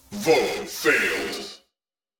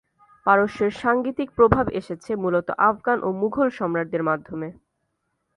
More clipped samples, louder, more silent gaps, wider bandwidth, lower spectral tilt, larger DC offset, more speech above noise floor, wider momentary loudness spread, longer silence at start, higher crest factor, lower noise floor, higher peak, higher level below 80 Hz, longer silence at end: neither; about the same, -22 LUFS vs -22 LUFS; neither; first, over 20 kHz vs 10.5 kHz; second, -2.5 dB/octave vs -8 dB/octave; neither; first, 65 dB vs 53 dB; first, 13 LU vs 10 LU; second, 0.1 s vs 0.45 s; about the same, 20 dB vs 20 dB; first, -87 dBFS vs -75 dBFS; second, -6 dBFS vs -2 dBFS; second, -58 dBFS vs -46 dBFS; second, 0.65 s vs 0.85 s